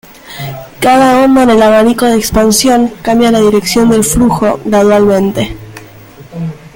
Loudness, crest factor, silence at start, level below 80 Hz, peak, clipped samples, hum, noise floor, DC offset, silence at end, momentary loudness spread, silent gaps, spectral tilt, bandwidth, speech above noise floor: -8 LUFS; 10 dB; 0.25 s; -32 dBFS; 0 dBFS; under 0.1%; none; -33 dBFS; under 0.1%; 0.05 s; 16 LU; none; -4.5 dB/octave; 17 kHz; 26 dB